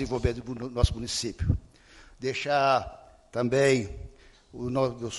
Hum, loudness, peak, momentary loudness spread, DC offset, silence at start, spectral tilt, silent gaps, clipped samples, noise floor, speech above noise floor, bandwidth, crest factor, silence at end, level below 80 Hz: none; -28 LUFS; -8 dBFS; 16 LU; under 0.1%; 0 s; -5 dB/octave; none; under 0.1%; -53 dBFS; 26 dB; 11.5 kHz; 20 dB; 0 s; -40 dBFS